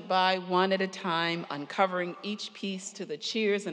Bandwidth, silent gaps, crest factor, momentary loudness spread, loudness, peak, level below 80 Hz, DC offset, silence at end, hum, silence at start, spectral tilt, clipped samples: 10.5 kHz; none; 18 dB; 10 LU; -30 LUFS; -12 dBFS; under -90 dBFS; under 0.1%; 0 s; none; 0 s; -4 dB/octave; under 0.1%